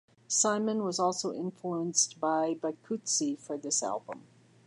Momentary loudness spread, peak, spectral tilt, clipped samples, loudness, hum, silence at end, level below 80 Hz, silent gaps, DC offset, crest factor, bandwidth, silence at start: 10 LU; -10 dBFS; -3 dB/octave; under 0.1%; -30 LUFS; none; 0.5 s; -86 dBFS; none; under 0.1%; 22 dB; 11.5 kHz; 0.3 s